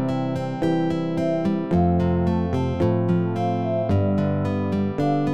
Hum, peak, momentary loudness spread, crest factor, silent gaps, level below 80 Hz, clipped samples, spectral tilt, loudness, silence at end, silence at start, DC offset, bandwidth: none; -8 dBFS; 4 LU; 12 dB; none; -42 dBFS; under 0.1%; -9 dB/octave; -22 LUFS; 0 s; 0 s; 0.8%; 8.4 kHz